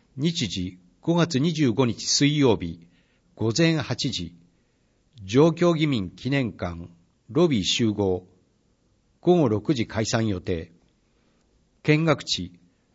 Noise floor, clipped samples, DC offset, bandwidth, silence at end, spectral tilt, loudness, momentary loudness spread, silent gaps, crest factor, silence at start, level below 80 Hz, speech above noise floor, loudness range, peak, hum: -66 dBFS; under 0.1%; under 0.1%; 8 kHz; 0.45 s; -5 dB/octave; -24 LUFS; 12 LU; none; 18 dB; 0.15 s; -54 dBFS; 43 dB; 3 LU; -6 dBFS; none